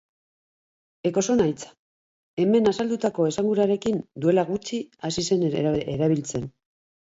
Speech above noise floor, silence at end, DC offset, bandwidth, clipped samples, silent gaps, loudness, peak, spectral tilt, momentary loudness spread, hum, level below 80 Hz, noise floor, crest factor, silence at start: over 67 dB; 0.5 s; under 0.1%; 8 kHz; under 0.1%; 1.79-2.37 s; -24 LUFS; -8 dBFS; -6 dB/octave; 11 LU; none; -58 dBFS; under -90 dBFS; 16 dB; 1.05 s